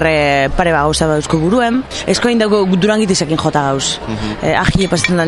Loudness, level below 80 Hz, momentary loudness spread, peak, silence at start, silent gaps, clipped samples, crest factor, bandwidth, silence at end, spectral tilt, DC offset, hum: -14 LUFS; -30 dBFS; 5 LU; 0 dBFS; 0 s; none; under 0.1%; 14 dB; 12 kHz; 0 s; -4.5 dB/octave; under 0.1%; none